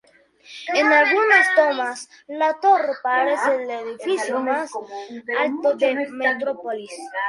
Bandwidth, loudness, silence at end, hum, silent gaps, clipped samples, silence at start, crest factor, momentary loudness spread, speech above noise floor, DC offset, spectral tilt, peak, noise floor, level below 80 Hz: 11.5 kHz; -19 LUFS; 0 s; none; none; under 0.1%; 0.5 s; 18 dB; 17 LU; 30 dB; under 0.1%; -2 dB/octave; -4 dBFS; -50 dBFS; -74 dBFS